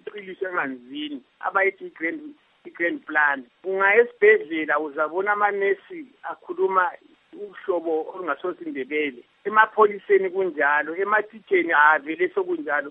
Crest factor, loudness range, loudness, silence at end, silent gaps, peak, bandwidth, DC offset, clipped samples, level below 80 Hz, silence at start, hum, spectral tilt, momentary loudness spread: 22 dB; 6 LU; -22 LUFS; 0 s; none; -2 dBFS; 3.9 kHz; under 0.1%; under 0.1%; -82 dBFS; 0.05 s; none; -7.5 dB/octave; 16 LU